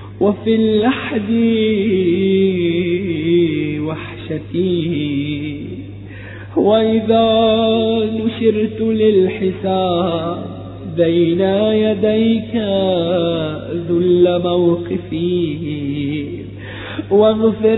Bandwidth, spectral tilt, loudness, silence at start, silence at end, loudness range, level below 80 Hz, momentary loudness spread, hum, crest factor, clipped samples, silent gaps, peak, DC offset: 4.1 kHz; -12 dB/octave; -16 LUFS; 0 s; 0 s; 4 LU; -44 dBFS; 13 LU; none; 14 dB; under 0.1%; none; -2 dBFS; under 0.1%